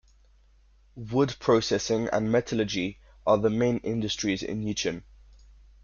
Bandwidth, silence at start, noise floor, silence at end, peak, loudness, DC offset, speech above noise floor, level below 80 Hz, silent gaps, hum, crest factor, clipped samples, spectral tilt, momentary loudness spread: 7.4 kHz; 0.95 s; -59 dBFS; 0.85 s; -10 dBFS; -27 LUFS; under 0.1%; 33 dB; -54 dBFS; none; none; 18 dB; under 0.1%; -5 dB/octave; 8 LU